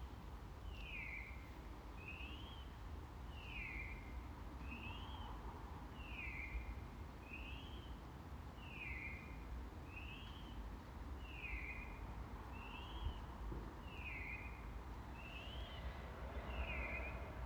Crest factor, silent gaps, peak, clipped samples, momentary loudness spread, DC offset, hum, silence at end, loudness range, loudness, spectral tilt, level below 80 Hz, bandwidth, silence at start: 18 dB; none; -32 dBFS; under 0.1%; 6 LU; under 0.1%; none; 0 s; 2 LU; -51 LUFS; -6 dB/octave; -52 dBFS; over 20 kHz; 0 s